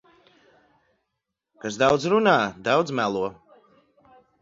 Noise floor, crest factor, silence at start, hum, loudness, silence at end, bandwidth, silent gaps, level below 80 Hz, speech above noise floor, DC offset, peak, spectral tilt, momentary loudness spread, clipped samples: -82 dBFS; 20 dB; 1.65 s; none; -22 LUFS; 1.1 s; 7.8 kHz; none; -62 dBFS; 60 dB; under 0.1%; -4 dBFS; -5 dB/octave; 13 LU; under 0.1%